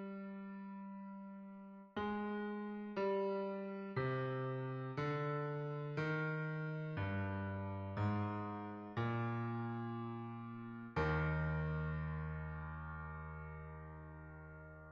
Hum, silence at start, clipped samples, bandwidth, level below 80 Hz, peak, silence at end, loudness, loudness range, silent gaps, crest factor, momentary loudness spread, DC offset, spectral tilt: none; 0 s; under 0.1%; 6.4 kHz; -56 dBFS; -26 dBFS; 0 s; -42 LUFS; 2 LU; none; 16 dB; 13 LU; under 0.1%; -7 dB/octave